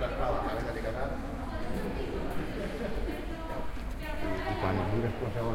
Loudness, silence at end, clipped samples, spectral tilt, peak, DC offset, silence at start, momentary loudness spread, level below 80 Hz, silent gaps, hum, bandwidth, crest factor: -35 LUFS; 0 s; under 0.1%; -7 dB/octave; -18 dBFS; under 0.1%; 0 s; 7 LU; -38 dBFS; none; none; 16.5 kHz; 14 dB